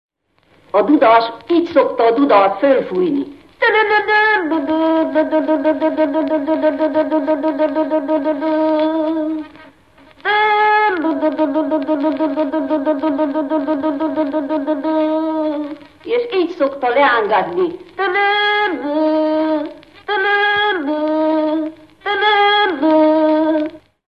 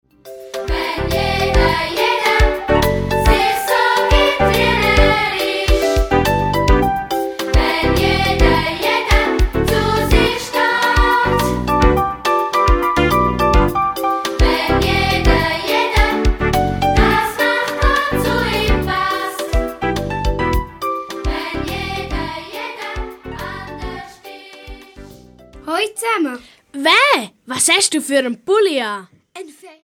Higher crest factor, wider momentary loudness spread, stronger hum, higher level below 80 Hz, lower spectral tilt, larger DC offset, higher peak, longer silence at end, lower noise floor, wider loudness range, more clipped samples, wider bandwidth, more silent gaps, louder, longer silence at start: about the same, 14 dB vs 16 dB; second, 8 LU vs 13 LU; neither; second, -60 dBFS vs -22 dBFS; first, -6 dB/octave vs -4.5 dB/octave; first, 0.1% vs under 0.1%; about the same, -2 dBFS vs 0 dBFS; first, 0.3 s vs 0.15 s; first, -56 dBFS vs -41 dBFS; second, 4 LU vs 10 LU; neither; second, 5.6 kHz vs 20 kHz; neither; about the same, -16 LUFS vs -16 LUFS; first, 0.75 s vs 0.25 s